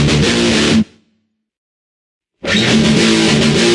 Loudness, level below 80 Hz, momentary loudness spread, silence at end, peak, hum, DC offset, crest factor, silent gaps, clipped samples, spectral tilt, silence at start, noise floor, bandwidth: -11 LUFS; -36 dBFS; 5 LU; 0 s; 0 dBFS; none; under 0.1%; 12 dB; 1.58-2.21 s; under 0.1%; -4.5 dB/octave; 0 s; -64 dBFS; 11.5 kHz